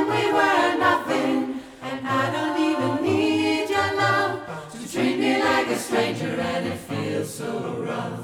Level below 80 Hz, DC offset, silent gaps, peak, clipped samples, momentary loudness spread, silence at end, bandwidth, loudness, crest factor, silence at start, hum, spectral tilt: -60 dBFS; under 0.1%; none; -6 dBFS; under 0.1%; 10 LU; 0 s; 17.5 kHz; -23 LUFS; 16 dB; 0 s; none; -5 dB/octave